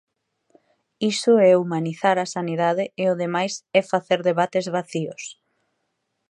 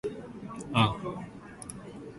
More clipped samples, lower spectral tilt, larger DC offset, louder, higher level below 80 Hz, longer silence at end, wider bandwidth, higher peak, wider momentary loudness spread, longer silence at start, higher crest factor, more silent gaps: neither; about the same, -5 dB/octave vs -5.5 dB/octave; neither; first, -21 LUFS vs -32 LUFS; second, -76 dBFS vs -56 dBFS; first, 1 s vs 0 s; about the same, 11 kHz vs 11.5 kHz; first, -4 dBFS vs -8 dBFS; second, 11 LU vs 17 LU; first, 1 s vs 0.05 s; second, 18 dB vs 24 dB; neither